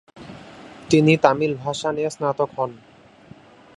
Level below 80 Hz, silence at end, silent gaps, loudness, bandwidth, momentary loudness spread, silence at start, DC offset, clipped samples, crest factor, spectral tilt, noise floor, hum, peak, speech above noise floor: -58 dBFS; 1 s; none; -20 LUFS; 11.5 kHz; 25 LU; 0.15 s; under 0.1%; under 0.1%; 22 dB; -6 dB/octave; -47 dBFS; none; 0 dBFS; 27 dB